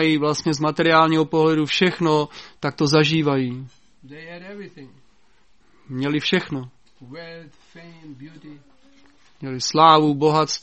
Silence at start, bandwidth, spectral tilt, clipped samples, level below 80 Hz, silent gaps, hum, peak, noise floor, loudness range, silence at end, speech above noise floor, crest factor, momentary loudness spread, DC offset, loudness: 0 s; 8.4 kHz; -5 dB/octave; under 0.1%; -60 dBFS; none; none; 0 dBFS; -60 dBFS; 10 LU; 0.05 s; 40 dB; 20 dB; 24 LU; 0.2%; -19 LUFS